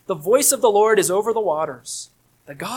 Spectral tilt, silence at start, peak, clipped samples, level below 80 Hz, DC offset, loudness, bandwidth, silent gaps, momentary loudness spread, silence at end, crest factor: -2.5 dB/octave; 0.1 s; -2 dBFS; under 0.1%; -66 dBFS; under 0.1%; -18 LUFS; 19 kHz; none; 16 LU; 0 s; 16 dB